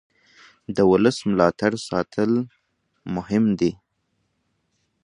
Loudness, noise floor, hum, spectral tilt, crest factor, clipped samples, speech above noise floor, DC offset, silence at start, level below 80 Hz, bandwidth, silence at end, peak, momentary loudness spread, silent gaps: -21 LUFS; -72 dBFS; none; -6.5 dB/octave; 22 dB; under 0.1%; 52 dB; under 0.1%; 0.7 s; -54 dBFS; 11 kHz; 1.35 s; -2 dBFS; 13 LU; none